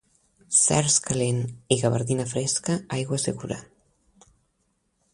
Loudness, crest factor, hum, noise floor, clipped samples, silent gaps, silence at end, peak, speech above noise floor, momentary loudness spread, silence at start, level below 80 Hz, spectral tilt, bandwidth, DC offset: -23 LUFS; 22 dB; none; -72 dBFS; under 0.1%; none; 1.5 s; -4 dBFS; 47 dB; 10 LU; 0.5 s; -56 dBFS; -4 dB/octave; 11.5 kHz; under 0.1%